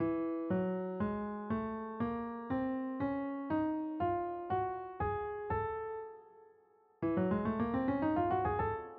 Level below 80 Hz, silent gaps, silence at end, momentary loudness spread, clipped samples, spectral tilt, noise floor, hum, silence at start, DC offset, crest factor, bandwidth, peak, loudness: -58 dBFS; none; 0 s; 7 LU; under 0.1%; -7.5 dB/octave; -67 dBFS; none; 0 s; under 0.1%; 14 dB; 4.6 kHz; -22 dBFS; -36 LUFS